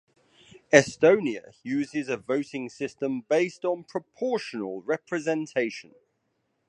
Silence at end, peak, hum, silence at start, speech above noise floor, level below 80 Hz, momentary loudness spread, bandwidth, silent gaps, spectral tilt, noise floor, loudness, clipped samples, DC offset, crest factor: 0.9 s; -2 dBFS; none; 0.7 s; 49 dB; -70 dBFS; 13 LU; 10.5 kHz; none; -4.5 dB/octave; -75 dBFS; -26 LUFS; under 0.1%; under 0.1%; 26 dB